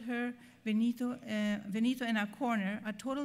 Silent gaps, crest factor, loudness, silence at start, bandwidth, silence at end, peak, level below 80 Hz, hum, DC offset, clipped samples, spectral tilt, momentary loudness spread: none; 14 dB; -35 LUFS; 0 s; 15.5 kHz; 0 s; -20 dBFS; -76 dBFS; none; under 0.1%; under 0.1%; -5.5 dB/octave; 6 LU